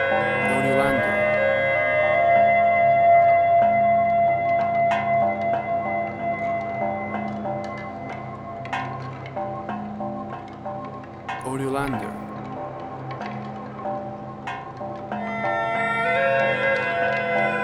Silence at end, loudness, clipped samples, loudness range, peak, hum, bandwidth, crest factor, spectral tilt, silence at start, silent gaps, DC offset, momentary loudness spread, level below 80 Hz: 0 s; -22 LUFS; under 0.1%; 13 LU; -8 dBFS; none; 12 kHz; 14 dB; -6.5 dB/octave; 0 s; none; under 0.1%; 16 LU; -54 dBFS